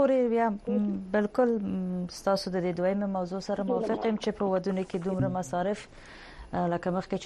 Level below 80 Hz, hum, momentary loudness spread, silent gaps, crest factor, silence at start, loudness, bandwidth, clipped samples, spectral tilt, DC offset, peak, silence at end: -56 dBFS; none; 7 LU; none; 16 dB; 0 s; -29 LUFS; 12 kHz; under 0.1%; -7 dB/octave; under 0.1%; -12 dBFS; 0 s